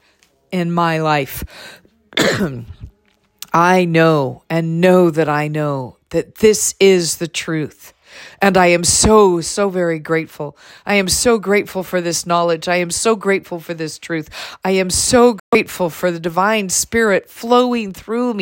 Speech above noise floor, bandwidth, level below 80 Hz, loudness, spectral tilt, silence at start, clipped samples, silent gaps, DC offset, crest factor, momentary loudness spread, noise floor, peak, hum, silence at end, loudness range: 43 dB; 16.5 kHz; -42 dBFS; -15 LUFS; -4 dB/octave; 0.5 s; under 0.1%; 15.40-15.52 s; under 0.1%; 16 dB; 13 LU; -59 dBFS; 0 dBFS; none; 0 s; 4 LU